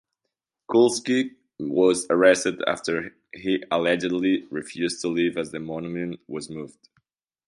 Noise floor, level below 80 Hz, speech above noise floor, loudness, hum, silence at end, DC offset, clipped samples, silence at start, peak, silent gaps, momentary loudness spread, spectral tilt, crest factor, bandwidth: -83 dBFS; -64 dBFS; 59 dB; -24 LUFS; none; 0.8 s; under 0.1%; under 0.1%; 0.7 s; -4 dBFS; none; 15 LU; -4 dB/octave; 20 dB; 11.5 kHz